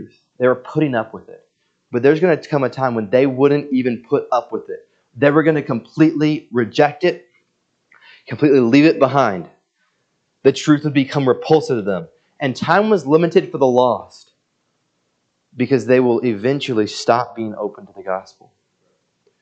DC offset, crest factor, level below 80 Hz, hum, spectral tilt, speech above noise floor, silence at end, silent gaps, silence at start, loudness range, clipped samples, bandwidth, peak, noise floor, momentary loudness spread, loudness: under 0.1%; 18 dB; -66 dBFS; none; -6.5 dB/octave; 52 dB; 1.2 s; none; 0 s; 3 LU; under 0.1%; 8.4 kHz; 0 dBFS; -68 dBFS; 12 LU; -17 LUFS